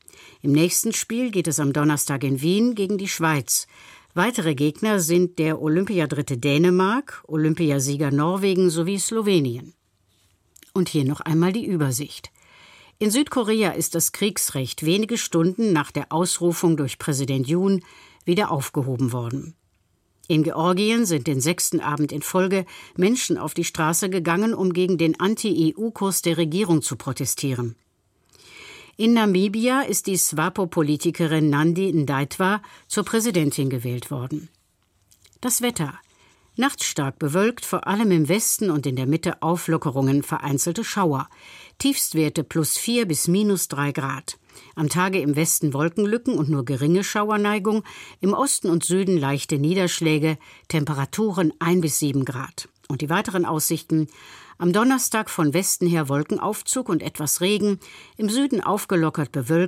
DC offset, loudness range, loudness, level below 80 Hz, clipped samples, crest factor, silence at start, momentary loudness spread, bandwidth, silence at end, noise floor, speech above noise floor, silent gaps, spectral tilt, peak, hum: under 0.1%; 3 LU; -22 LUFS; -62 dBFS; under 0.1%; 16 dB; 0.45 s; 7 LU; 16.5 kHz; 0 s; -66 dBFS; 44 dB; none; -4.5 dB/octave; -6 dBFS; none